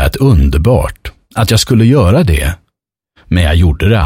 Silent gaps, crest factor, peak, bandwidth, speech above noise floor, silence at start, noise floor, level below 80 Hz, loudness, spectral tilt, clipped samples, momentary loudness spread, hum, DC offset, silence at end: none; 10 dB; 0 dBFS; 16.5 kHz; 62 dB; 0 s; -71 dBFS; -18 dBFS; -11 LUFS; -6 dB/octave; under 0.1%; 12 LU; none; under 0.1%; 0 s